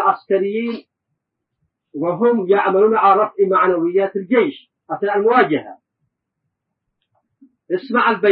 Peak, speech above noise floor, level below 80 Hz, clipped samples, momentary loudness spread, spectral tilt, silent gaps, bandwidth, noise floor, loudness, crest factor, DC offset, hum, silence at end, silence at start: 0 dBFS; 61 dB; -70 dBFS; under 0.1%; 11 LU; -11 dB/octave; none; 5 kHz; -77 dBFS; -17 LUFS; 18 dB; under 0.1%; none; 0 s; 0 s